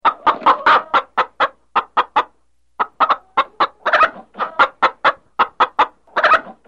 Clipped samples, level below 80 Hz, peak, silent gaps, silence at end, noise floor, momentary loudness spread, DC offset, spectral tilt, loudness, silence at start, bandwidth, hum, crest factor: under 0.1%; -56 dBFS; 0 dBFS; none; 0.15 s; -64 dBFS; 8 LU; 0.2%; -3 dB/octave; -17 LUFS; 0.05 s; 8.4 kHz; none; 16 dB